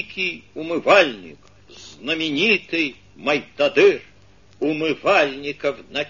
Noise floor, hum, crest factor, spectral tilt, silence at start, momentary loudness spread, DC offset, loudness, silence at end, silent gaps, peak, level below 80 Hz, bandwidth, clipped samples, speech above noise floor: -52 dBFS; 50 Hz at -55 dBFS; 20 dB; -4 dB/octave; 0 s; 12 LU; 0.2%; -20 LUFS; 0 s; none; 0 dBFS; -60 dBFS; 7.4 kHz; under 0.1%; 32 dB